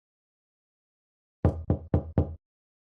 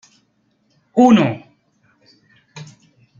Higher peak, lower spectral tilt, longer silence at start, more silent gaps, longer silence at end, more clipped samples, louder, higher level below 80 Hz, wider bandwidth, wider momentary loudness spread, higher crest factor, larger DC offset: second, -12 dBFS vs -2 dBFS; first, -11.5 dB/octave vs -6.5 dB/octave; first, 1.45 s vs 0.95 s; neither; about the same, 0.65 s vs 0.55 s; neither; second, -30 LUFS vs -14 LUFS; first, -44 dBFS vs -62 dBFS; second, 3.5 kHz vs 7.4 kHz; second, 7 LU vs 27 LU; about the same, 20 dB vs 18 dB; neither